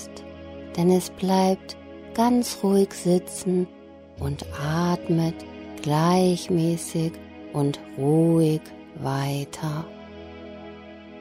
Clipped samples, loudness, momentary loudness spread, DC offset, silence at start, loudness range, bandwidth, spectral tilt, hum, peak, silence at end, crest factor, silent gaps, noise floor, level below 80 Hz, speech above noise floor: under 0.1%; -24 LUFS; 19 LU; under 0.1%; 0 s; 3 LU; 16 kHz; -6.5 dB/octave; none; -8 dBFS; 0 s; 16 dB; none; -42 dBFS; -52 dBFS; 19 dB